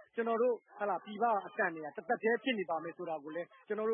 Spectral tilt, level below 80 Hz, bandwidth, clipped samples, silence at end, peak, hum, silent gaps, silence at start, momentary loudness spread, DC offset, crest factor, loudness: 0.5 dB/octave; under -90 dBFS; 3.6 kHz; under 0.1%; 0 s; -20 dBFS; none; none; 0 s; 9 LU; under 0.1%; 16 dB; -36 LUFS